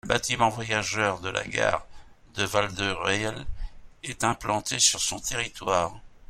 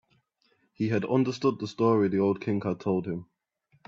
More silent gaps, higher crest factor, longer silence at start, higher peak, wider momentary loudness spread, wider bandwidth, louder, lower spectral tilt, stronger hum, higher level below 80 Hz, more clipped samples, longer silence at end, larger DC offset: neither; about the same, 22 dB vs 18 dB; second, 0.05 s vs 0.8 s; first, -6 dBFS vs -10 dBFS; first, 17 LU vs 7 LU; first, 16.5 kHz vs 7.6 kHz; about the same, -26 LUFS vs -27 LUFS; second, -2.5 dB/octave vs -8 dB/octave; neither; first, -44 dBFS vs -68 dBFS; neither; second, 0.05 s vs 0.65 s; neither